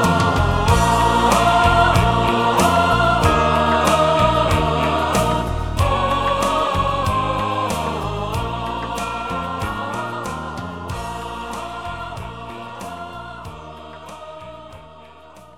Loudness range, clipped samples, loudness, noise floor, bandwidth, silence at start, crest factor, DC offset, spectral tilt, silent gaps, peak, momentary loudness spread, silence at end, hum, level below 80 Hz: 16 LU; under 0.1%; -18 LUFS; -43 dBFS; 18 kHz; 0 s; 16 dB; 0.3%; -5 dB/octave; none; -2 dBFS; 18 LU; 0.1 s; none; -30 dBFS